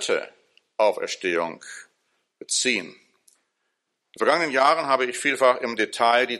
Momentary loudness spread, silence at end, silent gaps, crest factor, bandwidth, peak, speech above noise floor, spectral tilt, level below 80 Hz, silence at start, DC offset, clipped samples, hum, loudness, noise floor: 19 LU; 0 s; none; 20 dB; 13 kHz; -4 dBFS; 55 dB; -1.5 dB/octave; -76 dBFS; 0 s; under 0.1%; under 0.1%; none; -22 LUFS; -77 dBFS